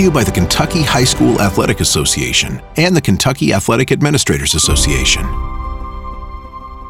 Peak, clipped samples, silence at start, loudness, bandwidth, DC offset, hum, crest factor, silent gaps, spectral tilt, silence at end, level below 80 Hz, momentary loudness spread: -2 dBFS; under 0.1%; 0 s; -13 LUFS; 17 kHz; under 0.1%; none; 12 dB; none; -4 dB/octave; 0 s; -24 dBFS; 16 LU